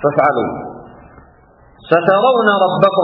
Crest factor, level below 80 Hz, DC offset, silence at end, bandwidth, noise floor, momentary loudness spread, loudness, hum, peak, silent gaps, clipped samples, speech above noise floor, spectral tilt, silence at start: 14 dB; -52 dBFS; under 0.1%; 0 s; 5.4 kHz; -47 dBFS; 13 LU; -13 LUFS; none; 0 dBFS; none; under 0.1%; 34 dB; -8.5 dB/octave; 0 s